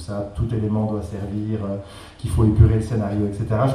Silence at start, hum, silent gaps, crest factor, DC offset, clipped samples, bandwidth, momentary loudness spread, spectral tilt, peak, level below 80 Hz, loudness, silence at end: 0 s; none; none; 18 dB; under 0.1%; under 0.1%; 11.5 kHz; 13 LU; -8.5 dB/octave; -2 dBFS; -32 dBFS; -22 LUFS; 0 s